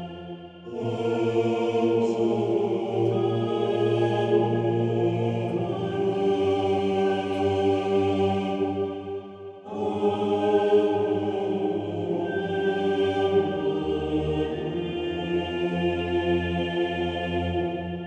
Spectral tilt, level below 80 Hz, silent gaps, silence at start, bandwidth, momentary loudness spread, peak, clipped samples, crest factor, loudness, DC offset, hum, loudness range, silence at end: -7.5 dB/octave; -52 dBFS; none; 0 s; 8.8 kHz; 7 LU; -10 dBFS; under 0.1%; 16 dB; -25 LUFS; under 0.1%; none; 2 LU; 0 s